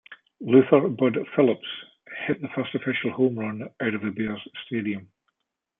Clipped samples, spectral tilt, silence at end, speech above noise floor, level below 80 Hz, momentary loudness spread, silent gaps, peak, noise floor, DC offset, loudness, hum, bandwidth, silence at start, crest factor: under 0.1%; -10.5 dB/octave; 0.75 s; 57 dB; -68 dBFS; 16 LU; none; -4 dBFS; -81 dBFS; under 0.1%; -24 LUFS; none; 3.8 kHz; 0.1 s; 22 dB